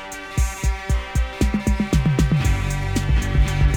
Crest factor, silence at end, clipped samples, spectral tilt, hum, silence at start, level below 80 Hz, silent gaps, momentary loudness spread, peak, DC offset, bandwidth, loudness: 14 dB; 0 s; under 0.1%; -6 dB/octave; none; 0 s; -22 dBFS; none; 6 LU; -6 dBFS; under 0.1%; 17.5 kHz; -22 LUFS